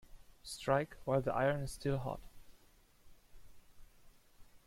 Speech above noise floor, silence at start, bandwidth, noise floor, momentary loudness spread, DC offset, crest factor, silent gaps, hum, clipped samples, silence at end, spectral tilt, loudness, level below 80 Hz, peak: 30 dB; 0.1 s; 16.5 kHz; -66 dBFS; 14 LU; under 0.1%; 22 dB; none; none; under 0.1%; 0.1 s; -6 dB/octave; -37 LUFS; -58 dBFS; -18 dBFS